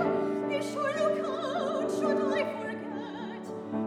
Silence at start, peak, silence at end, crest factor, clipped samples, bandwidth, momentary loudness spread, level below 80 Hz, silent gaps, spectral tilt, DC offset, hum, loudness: 0 s; -14 dBFS; 0 s; 16 dB; under 0.1%; 13 kHz; 10 LU; -74 dBFS; none; -5.5 dB/octave; under 0.1%; none; -31 LUFS